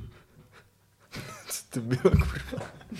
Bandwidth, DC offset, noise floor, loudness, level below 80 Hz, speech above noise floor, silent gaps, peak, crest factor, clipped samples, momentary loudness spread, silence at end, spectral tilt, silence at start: 15 kHz; under 0.1%; -62 dBFS; -29 LUFS; -38 dBFS; 35 dB; none; -8 dBFS; 22 dB; under 0.1%; 19 LU; 0 s; -6 dB/octave; 0 s